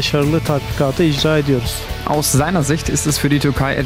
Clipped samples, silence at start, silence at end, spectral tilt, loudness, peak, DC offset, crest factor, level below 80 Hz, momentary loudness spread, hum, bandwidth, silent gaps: under 0.1%; 0 s; 0 s; -5 dB/octave; -16 LUFS; -4 dBFS; under 0.1%; 12 dB; -30 dBFS; 5 LU; none; 16 kHz; none